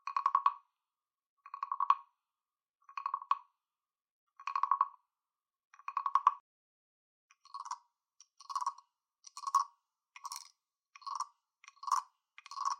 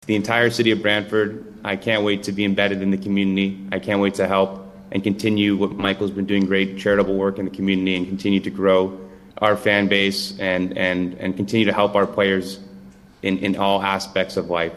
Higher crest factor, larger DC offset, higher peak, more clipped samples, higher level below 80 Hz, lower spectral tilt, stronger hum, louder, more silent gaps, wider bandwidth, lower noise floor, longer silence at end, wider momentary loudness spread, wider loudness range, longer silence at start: first, 28 dB vs 18 dB; neither; second, -12 dBFS vs -2 dBFS; neither; second, under -90 dBFS vs -54 dBFS; second, 7 dB/octave vs -5.5 dB/octave; neither; second, -36 LUFS vs -20 LUFS; first, 1.27-1.37 s, 4.11-4.27 s, 5.65-5.70 s, 6.40-7.30 s vs none; first, 14 kHz vs 12.5 kHz; first, under -90 dBFS vs -44 dBFS; about the same, 0.05 s vs 0 s; first, 20 LU vs 7 LU; first, 4 LU vs 1 LU; about the same, 0.05 s vs 0.05 s